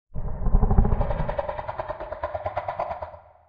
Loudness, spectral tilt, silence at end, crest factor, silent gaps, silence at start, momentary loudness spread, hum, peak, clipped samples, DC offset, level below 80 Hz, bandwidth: -28 LUFS; -10.5 dB/octave; 0.3 s; 22 dB; none; 0.1 s; 11 LU; none; -2 dBFS; under 0.1%; under 0.1%; -26 dBFS; 4.8 kHz